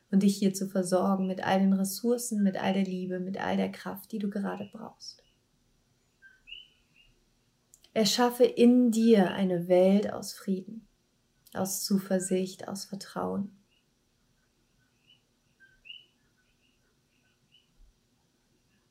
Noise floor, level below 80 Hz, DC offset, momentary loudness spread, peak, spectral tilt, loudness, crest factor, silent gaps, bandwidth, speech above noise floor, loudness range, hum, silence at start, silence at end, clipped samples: -71 dBFS; -72 dBFS; under 0.1%; 23 LU; -10 dBFS; -5.5 dB/octave; -28 LUFS; 20 dB; none; 16 kHz; 44 dB; 16 LU; none; 0.1 s; 2.95 s; under 0.1%